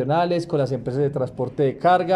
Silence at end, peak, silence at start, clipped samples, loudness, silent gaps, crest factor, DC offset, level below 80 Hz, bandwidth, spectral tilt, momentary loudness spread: 0 s; -6 dBFS; 0 s; under 0.1%; -22 LUFS; none; 14 dB; under 0.1%; -56 dBFS; 11 kHz; -7.5 dB/octave; 6 LU